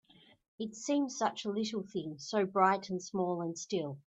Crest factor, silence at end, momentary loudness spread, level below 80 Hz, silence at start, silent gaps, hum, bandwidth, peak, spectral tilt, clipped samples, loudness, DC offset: 22 dB; 0.1 s; 11 LU; -80 dBFS; 0.6 s; none; none; 8.4 kHz; -14 dBFS; -4.5 dB/octave; under 0.1%; -34 LUFS; under 0.1%